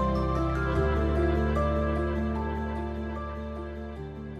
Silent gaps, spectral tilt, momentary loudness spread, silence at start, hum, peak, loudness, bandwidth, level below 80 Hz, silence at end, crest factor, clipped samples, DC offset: none; -8.5 dB/octave; 11 LU; 0 s; none; -14 dBFS; -29 LUFS; 7 kHz; -32 dBFS; 0 s; 14 dB; under 0.1%; under 0.1%